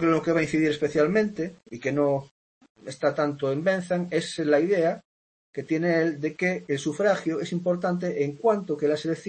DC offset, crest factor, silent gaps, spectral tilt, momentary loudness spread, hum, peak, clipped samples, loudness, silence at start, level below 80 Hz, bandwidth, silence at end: under 0.1%; 16 dB; 2.31-2.61 s, 2.69-2.75 s, 5.05-5.53 s; -6 dB/octave; 8 LU; none; -10 dBFS; under 0.1%; -25 LUFS; 0 s; -64 dBFS; 8.8 kHz; 0 s